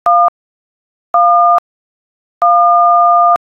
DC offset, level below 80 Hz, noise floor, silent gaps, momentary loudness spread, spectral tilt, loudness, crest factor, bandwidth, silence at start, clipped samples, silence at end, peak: under 0.1%; -62 dBFS; under -90 dBFS; 0.28-1.14 s, 1.59-2.41 s; 7 LU; -4.5 dB/octave; -10 LUFS; 10 dB; 4 kHz; 0.05 s; under 0.1%; 0.15 s; -2 dBFS